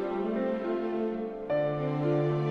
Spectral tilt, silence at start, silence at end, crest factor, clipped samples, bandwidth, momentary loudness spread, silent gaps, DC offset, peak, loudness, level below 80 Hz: -9.5 dB/octave; 0 s; 0 s; 12 dB; under 0.1%; 6.2 kHz; 4 LU; none; under 0.1%; -16 dBFS; -30 LUFS; -60 dBFS